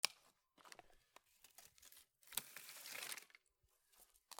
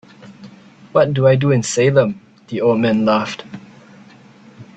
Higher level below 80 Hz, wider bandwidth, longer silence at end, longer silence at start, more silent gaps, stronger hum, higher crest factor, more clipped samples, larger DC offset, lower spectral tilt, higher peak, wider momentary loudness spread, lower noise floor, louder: second, -86 dBFS vs -54 dBFS; first, over 20 kHz vs 9.2 kHz; second, 0 s vs 0.15 s; second, 0.05 s vs 0.25 s; neither; neither; first, 42 dB vs 18 dB; neither; neither; second, 1.5 dB/octave vs -6 dB/octave; second, -14 dBFS vs 0 dBFS; first, 22 LU vs 18 LU; first, -81 dBFS vs -44 dBFS; second, -50 LUFS vs -16 LUFS